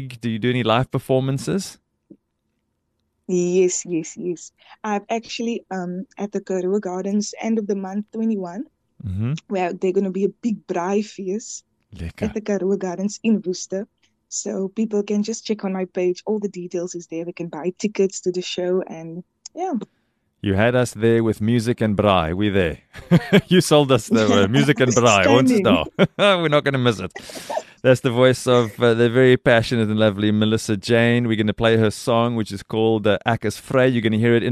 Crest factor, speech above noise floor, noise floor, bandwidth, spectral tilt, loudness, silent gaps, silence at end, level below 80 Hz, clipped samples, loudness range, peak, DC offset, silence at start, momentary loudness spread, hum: 18 dB; 53 dB; -73 dBFS; 13 kHz; -5.5 dB/octave; -20 LUFS; none; 0 s; -50 dBFS; under 0.1%; 9 LU; -2 dBFS; under 0.1%; 0 s; 13 LU; none